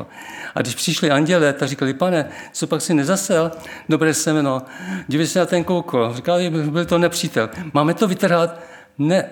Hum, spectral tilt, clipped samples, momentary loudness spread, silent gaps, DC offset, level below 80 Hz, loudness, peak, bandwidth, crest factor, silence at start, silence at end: none; -5 dB/octave; under 0.1%; 10 LU; none; under 0.1%; -58 dBFS; -19 LUFS; -2 dBFS; 20 kHz; 18 dB; 0 s; 0 s